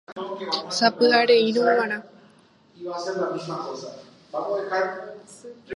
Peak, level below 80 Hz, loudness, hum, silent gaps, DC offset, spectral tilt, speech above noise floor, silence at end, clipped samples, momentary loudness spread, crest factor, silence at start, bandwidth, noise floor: -4 dBFS; -76 dBFS; -23 LUFS; none; 0.12-0.16 s; under 0.1%; -3.5 dB/octave; 32 dB; 0 s; under 0.1%; 21 LU; 22 dB; 0.1 s; 11.5 kHz; -56 dBFS